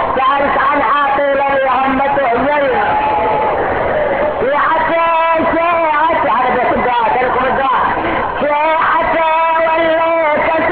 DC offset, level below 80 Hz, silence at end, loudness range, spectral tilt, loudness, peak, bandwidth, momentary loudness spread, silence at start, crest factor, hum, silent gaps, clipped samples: under 0.1%; -38 dBFS; 0 s; 1 LU; -8 dB/octave; -13 LUFS; -4 dBFS; 4.8 kHz; 3 LU; 0 s; 10 dB; none; none; under 0.1%